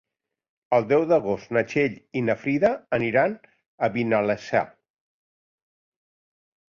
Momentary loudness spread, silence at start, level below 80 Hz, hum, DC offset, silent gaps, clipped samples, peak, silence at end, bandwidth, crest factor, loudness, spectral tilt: 6 LU; 0.7 s; -62 dBFS; none; under 0.1%; 3.66-3.78 s; under 0.1%; -8 dBFS; 2 s; 7.2 kHz; 18 dB; -24 LUFS; -7 dB/octave